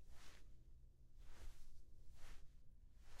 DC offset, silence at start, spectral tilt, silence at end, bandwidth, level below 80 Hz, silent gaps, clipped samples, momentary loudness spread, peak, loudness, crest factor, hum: under 0.1%; 0 s; -4 dB/octave; 0 s; 12 kHz; -60 dBFS; none; under 0.1%; 6 LU; -40 dBFS; -67 LUFS; 12 dB; none